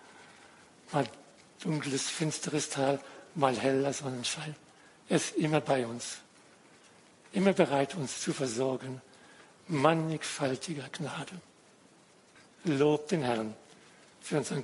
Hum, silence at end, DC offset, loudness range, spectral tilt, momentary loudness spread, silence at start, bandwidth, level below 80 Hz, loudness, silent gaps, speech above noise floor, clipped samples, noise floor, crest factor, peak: none; 0 s; under 0.1%; 3 LU; -4.5 dB/octave; 14 LU; 0.05 s; 11.5 kHz; -76 dBFS; -32 LUFS; none; 30 dB; under 0.1%; -61 dBFS; 24 dB; -8 dBFS